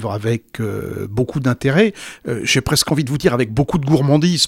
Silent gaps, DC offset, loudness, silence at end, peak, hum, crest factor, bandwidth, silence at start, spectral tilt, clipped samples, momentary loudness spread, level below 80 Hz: none; under 0.1%; -18 LUFS; 0 s; 0 dBFS; none; 16 dB; 16.5 kHz; 0 s; -5 dB/octave; under 0.1%; 9 LU; -42 dBFS